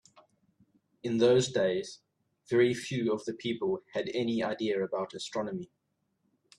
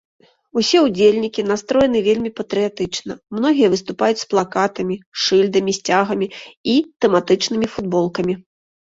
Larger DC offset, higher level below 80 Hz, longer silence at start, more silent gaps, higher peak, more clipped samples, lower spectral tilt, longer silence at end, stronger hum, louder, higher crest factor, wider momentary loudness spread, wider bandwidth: neither; second, -72 dBFS vs -54 dBFS; first, 1.05 s vs 0.55 s; second, none vs 5.06-5.12 s, 6.57-6.64 s, 6.96-7.00 s; second, -12 dBFS vs -2 dBFS; neither; about the same, -5 dB/octave vs -4.5 dB/octave; first, 0.95 s vs 0.6 s; neither; second, -31 LUFS vs -18 LUFS; about the same, 18 dB vs 16 dB; first, 12 LU vs 9 LU; first, 11.5 kHz vs 7.8 kHz